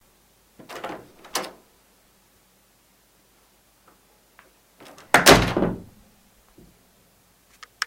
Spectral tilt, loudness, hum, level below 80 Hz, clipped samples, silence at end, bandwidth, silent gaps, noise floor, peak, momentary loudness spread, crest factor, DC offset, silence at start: -3 dB/octave; -19 LUFS; none; -44 dBFS; under 0.1%; 2.05 s; 16.5 kHz; none; -60 dBFS; 0 dBFS; 25 LU; 26 dB; under 0.1%; 0.7 s